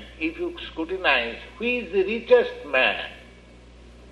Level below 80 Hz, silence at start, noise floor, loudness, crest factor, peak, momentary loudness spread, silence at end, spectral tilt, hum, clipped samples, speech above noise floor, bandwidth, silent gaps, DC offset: -48 dBFS; 0 s; -48 dBFS; -23 LUFS; 20 dB; -4 dBFS; 12 LU; 0 s; -5 dB/octave; none; under 0.1%; 24 dB; 8.4 kHz; none; under 0.1%